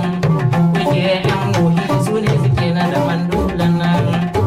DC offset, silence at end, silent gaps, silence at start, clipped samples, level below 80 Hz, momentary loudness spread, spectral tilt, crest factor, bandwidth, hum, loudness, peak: under 0.1%; 0 s; none; 0 s; under 0.1%; -36 dBFS; 2 LU; -7 dB/octave; 10 dB; 13.5 kHz; none; -16 LUFS; -6 dBFS